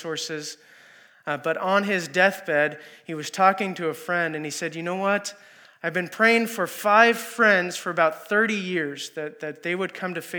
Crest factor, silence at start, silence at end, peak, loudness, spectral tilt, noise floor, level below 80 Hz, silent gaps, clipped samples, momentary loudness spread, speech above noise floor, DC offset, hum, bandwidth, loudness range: 22 dB; 0 s; 0 s; -2 dBFS; -23 LUFS; -4 dB/octave; -53 dBFS; under -90 dBFS; none; under 0.1%; 14 LU; 29 dB; under 0.1%; none; over 20 kHz; 4 LU